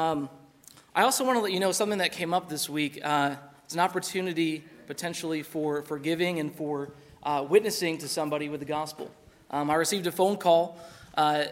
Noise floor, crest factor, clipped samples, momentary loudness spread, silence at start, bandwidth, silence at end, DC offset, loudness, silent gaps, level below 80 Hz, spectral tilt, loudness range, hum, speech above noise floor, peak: -55 dBFS; 22 dB; under 0.1%; 12 LU; 0 s; 16 kHz; 0 s; under 0.1%; -28 LUFS; none; -70 dBFS; -3.5 dB/octave; 3 LU; none; 27 dB; -8 dBFS